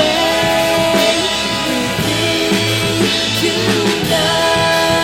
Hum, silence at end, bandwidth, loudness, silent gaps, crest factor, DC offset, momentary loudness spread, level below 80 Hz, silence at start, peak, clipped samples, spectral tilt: none; 0 s; 16.5 kHz; -14 LUFS; none; 14 dB; under 0.1%; 3 LU; -40 dBFS; 0 s; 0 dBFS; under 0.1%; -3.5 dB/octave